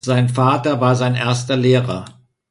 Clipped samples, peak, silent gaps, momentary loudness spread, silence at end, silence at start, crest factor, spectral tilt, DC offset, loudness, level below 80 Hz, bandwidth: under 0.1%; -2 dBFS; none; 4 LU; 0.4 s; 0.05 s; 14 dB; -6.5 dB/octave; under 0.1%; -17 LUFS; -52 dBFS; 11.5 kHz